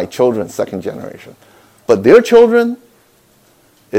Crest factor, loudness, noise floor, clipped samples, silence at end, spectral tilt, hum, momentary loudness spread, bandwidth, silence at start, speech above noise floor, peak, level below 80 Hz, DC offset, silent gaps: 14 dB; -12 LUFS; -51 dBFS; 1%; 0 s; -5.5 dB/octave; none; 22 LU; 15.5 kHz; 0 s; 39 dB; 0 dBFS; -54 dBFS; under 0.1%; none